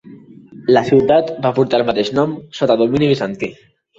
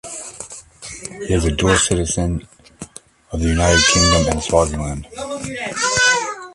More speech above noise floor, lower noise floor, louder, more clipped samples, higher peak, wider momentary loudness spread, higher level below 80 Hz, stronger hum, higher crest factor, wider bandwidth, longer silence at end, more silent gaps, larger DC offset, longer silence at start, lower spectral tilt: about the same, 25 dB vs 22 dB; about the same, -39 dBFS vs -39 dBFS; about the same, -16 LUFS vs -16 LUFS; neither; about the same, -2 dBFS vs 0 dBFS; second, 10 LU vs 21 LU; second, -52 dBFS vs -30 dBFS; neither; about the same, 14 dB vs 18 dB; second, 7.8 kHz vs 11.5 kHz; first, 0.45 s vs 0 s; neither; neither; about the same, 0.05 s vs 0.05 s; first, -7 dB/octave vs -3.5 dB/octave